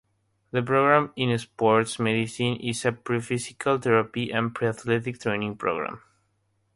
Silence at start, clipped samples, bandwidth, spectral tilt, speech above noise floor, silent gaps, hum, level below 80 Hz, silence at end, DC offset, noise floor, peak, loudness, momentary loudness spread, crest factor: 0.55 s; under 0.1%; 11.5 kHz; -5.5 dB/octave; 46 dB; none; none; -62 dBFS; 0.8 s; under 0.1%; -71 dBFS; -4 dBFS; -25 LUFS; 8 LU; 22 dB